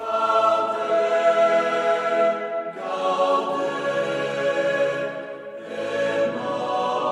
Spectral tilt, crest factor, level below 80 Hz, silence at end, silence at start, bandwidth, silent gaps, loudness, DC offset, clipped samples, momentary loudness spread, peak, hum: -4.5 dB/octave; 14 dB; -76 dBFS; 0 s; 0 s; 11.5 kHz; none; -22 LUFS; under 0.1%; under 0.1%; 10 LU; -8 dBFS; none